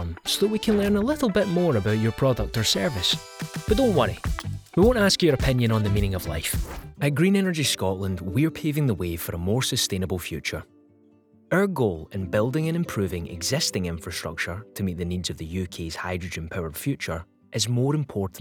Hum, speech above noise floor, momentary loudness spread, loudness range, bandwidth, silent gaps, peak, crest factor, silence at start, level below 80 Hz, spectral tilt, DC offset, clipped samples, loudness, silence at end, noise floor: none; 33 dB; 10 LU; 6 LU; over 20 kHz; none; -6 dBFS; 18 dB; 0 s; -40 dBFS; -5 dB/octave; under 0.1%; under 0.1%; -25 LUFS; 0 s; -57 dBFS